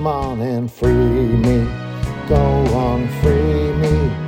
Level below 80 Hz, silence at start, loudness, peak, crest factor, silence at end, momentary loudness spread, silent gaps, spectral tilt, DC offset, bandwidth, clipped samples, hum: -24 dBFS; 0 s; -17 LUFS; -2 dBFS; 16 dB; 0 s; 7 LU; none; -8.5 dB/octave; under 0.1%; 16 kHz; under 0.1%; none